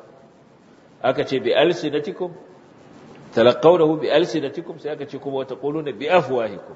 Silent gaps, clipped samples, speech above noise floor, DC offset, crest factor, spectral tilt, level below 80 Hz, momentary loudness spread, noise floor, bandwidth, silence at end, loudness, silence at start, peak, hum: none; under 0.1%; 30 dB; under 0.1%; 20 dB; -6 dB/octave; -66 dBFS; 15 LU; -50 dBFS; 8 kHz; 0 s; -21 LUFS; 1.05 s; -2 dBFS; none